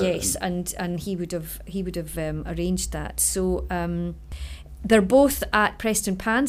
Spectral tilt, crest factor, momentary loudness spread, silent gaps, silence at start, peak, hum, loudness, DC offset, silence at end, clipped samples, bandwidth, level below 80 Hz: -4 dB/octave; 20 dB; 14 LU; none; 0 s; -4 dBFS; none; -24 LUFS; under 0.1%; 0 s; under 0.1%; 16 kHz; -38 dBFS